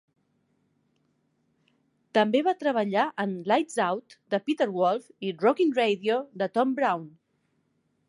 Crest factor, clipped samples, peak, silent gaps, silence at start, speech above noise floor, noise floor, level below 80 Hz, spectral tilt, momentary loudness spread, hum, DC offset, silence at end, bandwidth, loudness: 20 dB; under 0.1%; -8 dBFS; none; 2.15 s; 47 dB; -73 dBFS; -82 dBFS; -5.5 dB/octave; 7 LU; none; under 0.1%; 1 s; 11.5 kHz; -26 LUFS